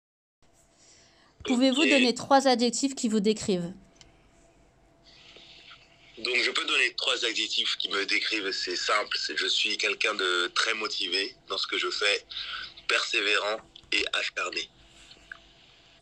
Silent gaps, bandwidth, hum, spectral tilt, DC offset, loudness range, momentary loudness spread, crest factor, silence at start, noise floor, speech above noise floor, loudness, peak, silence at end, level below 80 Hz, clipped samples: none; 11 kHz; none; -2 dB/octave; under 0.1%; 5 LU; 11 LU; 20 dB; 1.4 s; -61 dBFS; 34 dB; -26 LUFS; -8 dBFS; 1.35 s; -66 dBFS; under 0.1%